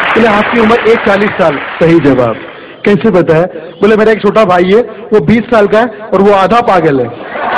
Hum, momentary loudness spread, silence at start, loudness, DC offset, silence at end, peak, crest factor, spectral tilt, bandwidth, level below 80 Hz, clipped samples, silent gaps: none; 7 LU; 0 s; -8 LUFS; 0.3%; 0 s; 0 dBFS; 8 dB; -7 dB/octave; 10.5 kHz; -38 dBFS; 1%; none